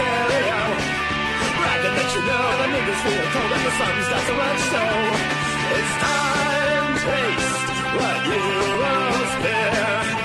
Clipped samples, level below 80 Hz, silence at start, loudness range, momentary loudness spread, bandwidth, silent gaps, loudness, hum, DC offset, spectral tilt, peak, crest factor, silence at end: under 0.1%; -44 dBFS; 0 s; 0 LU; 2 LU; 13 kHz; none; -20 LUFS; none; under 0.1%; -3.5 dB/octave; -8 dBFS; 14 dB; 0 s